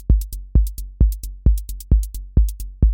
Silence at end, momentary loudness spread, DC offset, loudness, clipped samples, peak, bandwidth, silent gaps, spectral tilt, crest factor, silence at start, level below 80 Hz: 0 s; 3 LU; under 0.1%; -22 LUFS; under 0.1%; -4 dBFS; 17 kHz; none; -8 dB/octave; 14 dB; 0 s; -18 dBFS